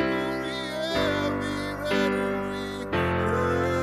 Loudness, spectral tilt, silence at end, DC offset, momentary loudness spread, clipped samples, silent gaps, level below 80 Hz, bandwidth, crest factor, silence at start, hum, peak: -27 LUFS; -5.5 dB/octave; 0 s; under 0.1%; 5 LU; under 0.1%; none; -46 dBFS; 15 kHz; 14 dB; 0 s; none; -12 dBFS